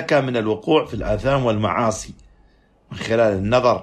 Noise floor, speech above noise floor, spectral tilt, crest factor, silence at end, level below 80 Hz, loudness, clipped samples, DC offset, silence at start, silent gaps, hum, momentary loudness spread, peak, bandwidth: -55 dBFS; 36 dB; -6 dB/octave; 16 dB; 0 s; -40 dBFS; -20 LUFS; under 0.1%; under 0.1%; 0 s; none; none; 13 LU; -4 dBFS; 12.5 kHz